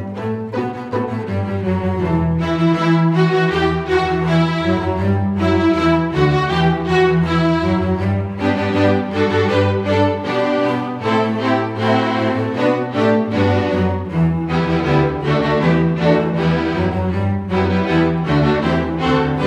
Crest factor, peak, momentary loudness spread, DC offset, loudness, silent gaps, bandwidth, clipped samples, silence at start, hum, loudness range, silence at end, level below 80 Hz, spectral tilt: 14 dB; -4 dBFS; 5 LU; under 0.1%; -17 LUFS; none; 8.6 kHz; under 0.1%; 0 s; none; 1 LU; 0 s; -38 dBFS; -7.5 dB/octave